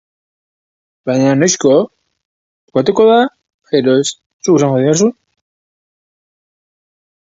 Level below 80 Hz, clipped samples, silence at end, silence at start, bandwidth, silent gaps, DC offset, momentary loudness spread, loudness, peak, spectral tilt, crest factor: -60 dBFS; under 0.1%; 2.3 s; 1.05 s; 8 kHz; 2.25-2.68 s, 3.54-3.59 s, 4.26-4.40 s; under 0.1%; 10 LU; -13 LUFS; 0 dBFS; -5 dB/octave; 16 dB